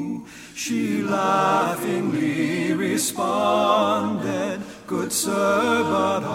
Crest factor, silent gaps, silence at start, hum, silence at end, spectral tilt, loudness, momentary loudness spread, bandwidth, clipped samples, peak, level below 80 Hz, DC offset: 16 dB; none; 0 s; none; 0 s; -4 dB/octave; -22 LUFS; 10 LU; 16.5 kHz; under 0.1%; -6 dBFS; -62 dBFS; under 0.1%